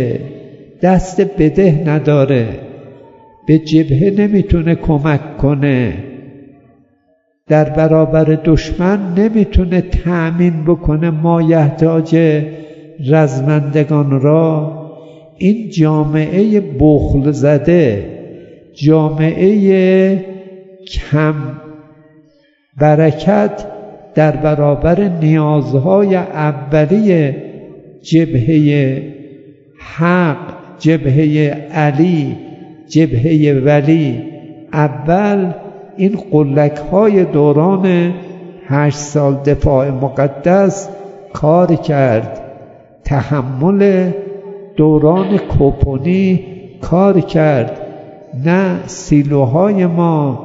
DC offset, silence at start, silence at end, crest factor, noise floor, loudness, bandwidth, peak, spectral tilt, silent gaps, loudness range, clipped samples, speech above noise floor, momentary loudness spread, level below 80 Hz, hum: under 0.1%; 0 s; 0 s; 12 dB; -58 dBFS; -12 LUFS; 7.8 kHz; 0 dBFS; -8.5 dB/octave; none; 3 LU; under 0.1%; 47 dB; 16 LU; -30 dBFS; none